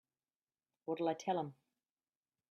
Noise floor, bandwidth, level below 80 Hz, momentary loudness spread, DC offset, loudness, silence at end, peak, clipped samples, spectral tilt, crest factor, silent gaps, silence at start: under -90 dBFS; 12.5 kHz; under -90 dBFS; 11 LU; under 0.1%; -40 LUFS; 1 s; -24 dBFS; under 0.1%; -6 dB/octave; 20 dB; none; 0.85 s